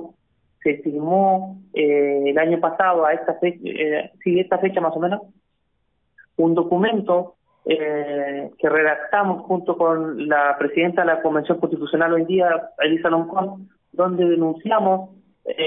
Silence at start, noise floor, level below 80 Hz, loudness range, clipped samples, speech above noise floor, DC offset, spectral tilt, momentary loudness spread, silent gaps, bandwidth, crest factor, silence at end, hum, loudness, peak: 0 s; -71 dBFS; -66 dBFS; 3 LU; under 0.1%; 51 dB; under 0.1%; -11 dB/octave; 7 LU; none; 3.8 kHz; 16 dB; 0 s; none; -20 LUFS; -4 dBFS